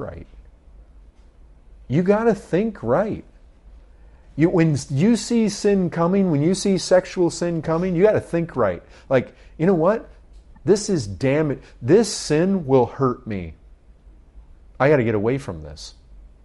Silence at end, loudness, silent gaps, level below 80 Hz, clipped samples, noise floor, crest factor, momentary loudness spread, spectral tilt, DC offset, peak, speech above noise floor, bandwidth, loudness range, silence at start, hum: 0.15 s; -20 LUFS; none; -46 dBFS; under 0.1%; -48 dBFS; 16 dB; 14 LU; -6.5 dB/octave; under 0.1%; -4 dBFS; 28 dB; 11.5 kHz; 4 LU; 0 s; none